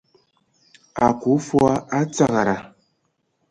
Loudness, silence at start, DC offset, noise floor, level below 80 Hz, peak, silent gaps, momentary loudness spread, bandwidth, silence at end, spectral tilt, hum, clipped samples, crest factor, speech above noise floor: -20 LUFS; 0.95 s; under 0.1%; -70 dBFS; -54 dBFS; -2 dBFS; none; 6 LU; 11 kHz; 0.85 s; -6.5 dB/octave; none; under 0.1%; 20 dB; 51 dB